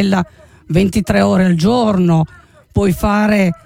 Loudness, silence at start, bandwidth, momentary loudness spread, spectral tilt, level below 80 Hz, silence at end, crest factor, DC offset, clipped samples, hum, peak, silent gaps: -14 LUFS; 0 s; 16 kHz; 6 LU; -7 dB/octave; -32 dBFS; 0.1 s; 12 dB; under 0.1%; under 0.1%; none; -2 dBFS; none